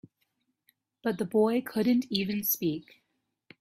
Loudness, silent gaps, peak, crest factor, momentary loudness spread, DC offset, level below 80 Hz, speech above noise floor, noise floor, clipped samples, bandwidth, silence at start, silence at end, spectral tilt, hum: -29 LUFS; none; -12 dBFS; 18 dB; 8 LU; under 0.1%; -70 dBFS; 49 dB; -77 dBFS; under 0.1%; 16 kHz; 1.05 s; 0.8 s; -5 dB/octave; none